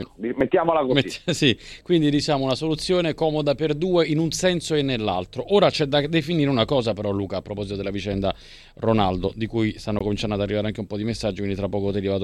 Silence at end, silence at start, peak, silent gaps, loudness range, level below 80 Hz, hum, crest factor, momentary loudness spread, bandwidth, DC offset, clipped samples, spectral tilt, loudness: 0 s; 0 s; -4 dBFS; none; 4 LU; -44 dBFS; none; 20 dB; 8 LU; 13.5 kHz; under 0.1%; under 0.1%; -5.5 dB/octave; -23 LUFS